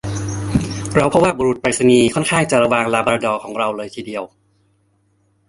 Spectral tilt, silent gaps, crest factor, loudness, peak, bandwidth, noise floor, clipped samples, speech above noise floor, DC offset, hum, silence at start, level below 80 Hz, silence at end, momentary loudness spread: -5 dB/octave; none; 18 dB; -17 LUFS; 0 dBFS; 11.5 kHz; -61 dBFS; under 0.1%; 45 dB; under 0.1%; none; 0.05 s; -42 dBFS; 1.25 s; 14 LU